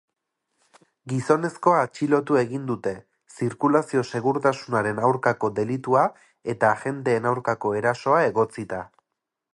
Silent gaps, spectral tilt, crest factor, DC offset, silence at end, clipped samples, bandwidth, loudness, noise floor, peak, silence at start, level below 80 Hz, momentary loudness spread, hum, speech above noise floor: none; -6.5 dB/octave; 20 dB; under 0.1%; 0.7 s; under 0.1%; 11.5 kHz; -23 LUFS; -83 dBFS; -4 dBFS; 1.05 s; -64 dBFS; 9 LU; none; 60 dB